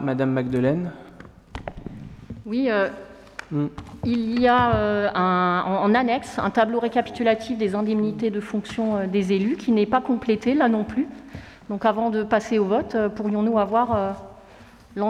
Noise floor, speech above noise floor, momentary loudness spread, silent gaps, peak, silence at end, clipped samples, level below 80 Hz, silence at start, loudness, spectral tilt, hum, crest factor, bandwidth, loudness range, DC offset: -47 dBFS; 26 dB; 17 LU; none; -8 dBFS; 0 s; under 0.1%; -50 dBFS; 0 s; -22 LUFS; -7 dB/octave; none; 16 dB; 10.5 kHz; 5 LU; under 0.1%